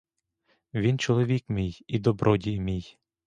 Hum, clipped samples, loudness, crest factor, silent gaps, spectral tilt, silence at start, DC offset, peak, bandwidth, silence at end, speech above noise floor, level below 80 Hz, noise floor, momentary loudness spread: none; under 0.1%; -27 LUFS; 20 dB; none; -7 dB/octave; 0.75 s; under 0.1%; -8 dBFS; 9.2 kHz; 0.35 s; 46 dB; -48 dBFS; -72 dBFS; 8 LU